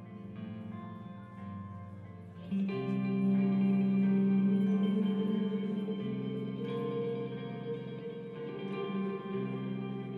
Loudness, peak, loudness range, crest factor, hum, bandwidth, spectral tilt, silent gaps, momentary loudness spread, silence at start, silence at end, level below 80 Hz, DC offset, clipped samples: -33 LUFS; -22 dBFS; 8 LU; 12 dB; none; 4.3 kHz; -10 dB/octave; none; 17 LU; 0 s; 0 s; -76 dBFS; under 0.1%; under 0.1%